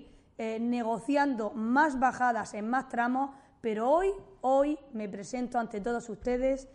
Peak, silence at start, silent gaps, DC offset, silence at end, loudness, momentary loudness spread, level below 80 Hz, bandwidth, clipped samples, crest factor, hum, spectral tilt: -14 dBFS; 0 s; none; under 0.1%; 0.1 s; -30 LUFS; 10 LU; -56 dBFS; 11 kHz; under 0.1%; 16 dB; none; -5.5 dB/octave